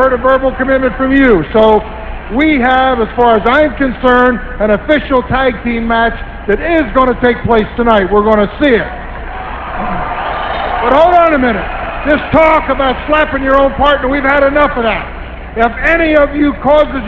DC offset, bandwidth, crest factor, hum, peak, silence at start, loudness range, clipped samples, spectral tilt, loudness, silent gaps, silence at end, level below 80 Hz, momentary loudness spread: 0.6%; 8 kHz; 10 dB; none; 0 dBFS; 0 s; 2 LU; 0.3%; -7.5 dB/octave; -11 LUFS; none; 0 s; -26 dBFS; 10 LU